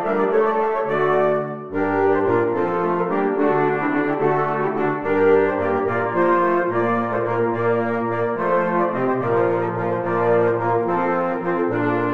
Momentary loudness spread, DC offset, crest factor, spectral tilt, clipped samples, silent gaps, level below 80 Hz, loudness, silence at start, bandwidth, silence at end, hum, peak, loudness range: 4 LU; 0.8%; 14 dB; -9 dB/octave; under 0.1%; none; -62 dBFS; -20 LUFS; 0 s; 6 kHz; 0 s; none; -4 dBFS; 1 LU